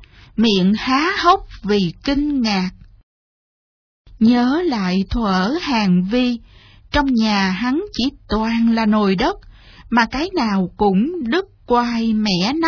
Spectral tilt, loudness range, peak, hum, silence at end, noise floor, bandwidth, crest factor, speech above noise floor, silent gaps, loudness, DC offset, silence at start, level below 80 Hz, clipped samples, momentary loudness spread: -6 dB/octave; 2 LU; -2 dBFS; none; 0 s; under -90 dBFS; 5.4 kHz; 16 dB; over 73 dB; 3.03-4.05 s; -18 LUFS; under 0.1%; 0 s; -38 dBFS; under 0.1%; 6 LU